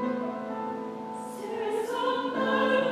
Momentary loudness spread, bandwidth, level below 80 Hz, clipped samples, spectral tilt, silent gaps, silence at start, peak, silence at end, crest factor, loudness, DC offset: 12 LU; 15 kHz; -76 dBFS; under 0.1%; -5 dB/octave; none; 0 s; -14 dBFS; 0 s; 16 dB; -30 LUFS; under 0.1%